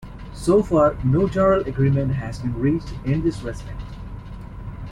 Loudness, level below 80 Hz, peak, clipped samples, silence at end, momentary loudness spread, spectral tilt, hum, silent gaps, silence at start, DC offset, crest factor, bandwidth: -21 LUFS; -36 dBFS; -6 dBFS; under 0.1%; 0 s; 18 LU; -8.5 dB/octave; none; none; 0 s; under 0.1%; 16 dB; 11.5 kHz